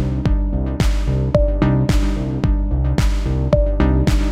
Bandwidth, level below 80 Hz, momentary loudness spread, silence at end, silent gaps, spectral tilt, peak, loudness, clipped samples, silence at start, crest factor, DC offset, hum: 11.5 kHz; -18 dBFS; 4 LU; 0 s; none; -7.5 dB/octave; 0 dBFS; -18 LUFS; under 0.1%; 0 s; 16 dB; under 0.1%; none